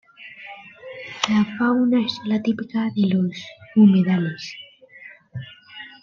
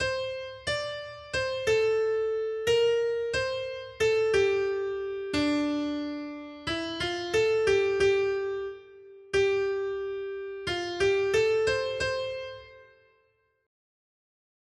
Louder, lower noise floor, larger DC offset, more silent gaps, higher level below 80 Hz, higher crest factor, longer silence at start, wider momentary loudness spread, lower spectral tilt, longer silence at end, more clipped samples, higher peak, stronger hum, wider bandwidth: first, -20 LUFS vs -28 LUFS; second, -45 dBFS vs -70 dBFS; neither; neither; second, -66 dBFS vs -56 dBFS; about the same, 20 dB vs 16 dB; first, 0.2 s vs 0 s; first, 23 LU vs 11 LU; first, -6.5 dB/octave vs -4 dB/octave; second, 0.15 s vs 1.8 s; neither; first, -2 dBFS vs -14 dBFS; neither; second, 7.2 kHz vs 12.5 kHz